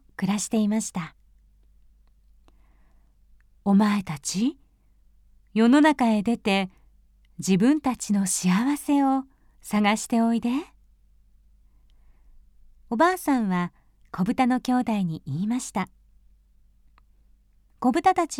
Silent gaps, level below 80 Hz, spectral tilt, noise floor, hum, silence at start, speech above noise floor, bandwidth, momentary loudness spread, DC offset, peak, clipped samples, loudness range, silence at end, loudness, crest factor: none; -56 dBFS; -5 dB/octave; -59 dBFS; none; 0.2 s; 36 dB; 16.5 kHz; 11 LU; under 0.1%; -8 dBFS; under 0.1%; 7 LU; 0 s; -24 LUFS; 18 dB